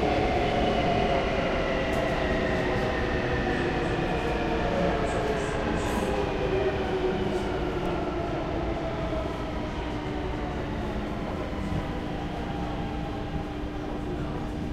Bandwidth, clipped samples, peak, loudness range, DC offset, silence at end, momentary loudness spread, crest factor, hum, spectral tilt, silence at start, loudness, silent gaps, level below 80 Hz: 14 kHz; under 0.1%; -12 dBFS; 6 LU; under 0.1%; 0 s; 7 LU; 16 dB; none; -6.5 dB/octave; 0 s; -29 LUFS; none; -36 dBFS